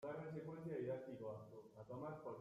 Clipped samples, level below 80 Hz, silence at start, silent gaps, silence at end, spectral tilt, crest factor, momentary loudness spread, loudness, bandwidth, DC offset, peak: under 0.1%; -82 dBFS; 0 s; none; 0 s; -9 dB/octave; 14 dB; 9 LU; -51 LUFS; 14 kHz; under 0.1%; -36 dBFS